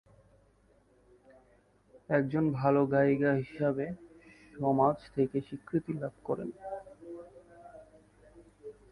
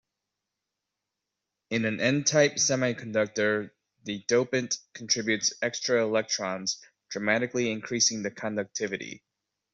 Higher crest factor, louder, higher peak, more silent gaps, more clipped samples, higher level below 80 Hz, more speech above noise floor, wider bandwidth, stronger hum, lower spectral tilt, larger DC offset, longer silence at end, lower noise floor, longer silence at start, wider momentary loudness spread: about the same, 20 dB vs 20 dB; second, -31 LUFS vs -27 LUFS; second, -14 dBFS vs -8 dBFS; neither; neither; about the same, -66 dBFS vs -70 dBFS; second, 36 dB vs 58 dB; first, 10.5 kHz vs 8 kHz; first, 50 Hz at -60 dBFS vs none; first, -9.5 dB/octave vs -3 dB/octave; neither; second, 0.2 s vs 0.55 s; second, -66 dBFS vs -86 dBFS; first, 1.95 s vs 1.7 s; first, 24 LU vs 12 LU